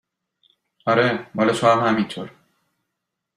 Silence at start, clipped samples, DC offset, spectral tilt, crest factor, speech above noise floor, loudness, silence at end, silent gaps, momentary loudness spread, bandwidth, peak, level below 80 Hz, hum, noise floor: 0.85 s; under 0.1%; under 0.1%; -5.5 dB/octave; 20 dB; 61 dB; -20 LUFS; 1.05 s; none; 14 LU; 14 kHz; -2 dBFS; -64 dBFS; none; -80 dBFS